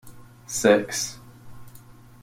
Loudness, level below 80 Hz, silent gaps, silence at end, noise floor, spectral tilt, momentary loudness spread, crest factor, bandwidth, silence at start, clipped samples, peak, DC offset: -23 LUFS; -56 dBFS; none; 0.45 s; -47 dBFS; -3 dB/octave; 14 LU; 22 dB; 16.5 kHz; 0.05 s; under 0.1%; -4 dBFS; under 0.1%